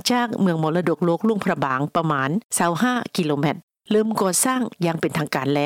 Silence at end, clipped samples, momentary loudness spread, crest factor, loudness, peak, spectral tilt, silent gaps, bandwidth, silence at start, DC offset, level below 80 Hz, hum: 0 s; under 0.1%; 4 LU; 14 dB; -21 LUFS; -6 dBFS; -4.5 dB/octave; 2.44-2.49 s, 3.63-3.68 s; 17.5 kHz; 0.05 s; under 0.1%; -66 dBFS; none